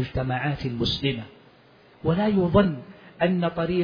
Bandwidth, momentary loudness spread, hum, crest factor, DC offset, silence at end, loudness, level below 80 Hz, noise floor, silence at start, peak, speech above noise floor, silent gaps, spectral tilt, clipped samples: 5.2 kHz; 10 LU; none; 20 dB; under 0.1%; 0 s; -24 LUFS; -46 dBFS; -54 dBFS; 0 s; -6 dBFS; 31 dB; none; -8 dB/octave; under 0.1%